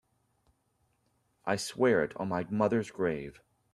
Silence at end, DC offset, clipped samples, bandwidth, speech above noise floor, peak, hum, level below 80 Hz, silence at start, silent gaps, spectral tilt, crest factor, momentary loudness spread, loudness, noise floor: 0.45 s; under 0.1%; under 0.1%; 14 kHz; 44 dB; -12 dBFS; none; -66 dBFS; 1.45 s; none; -5.5 dB/octave; 20 dB; 12 LU; -31 LUFS; -75 dBFS